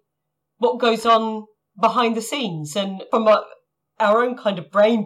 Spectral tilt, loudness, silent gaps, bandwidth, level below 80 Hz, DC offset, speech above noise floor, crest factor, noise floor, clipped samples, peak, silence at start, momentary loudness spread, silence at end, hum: -4.5 dB/octave; -20 LUFS; none; 15 kHz; -72 dBFS; under 0.1%; 60 dB; 14 dB; -79 dBFS; under 0.1%; -6 dBFS; 0.6 s; 8 LU; 0 s; none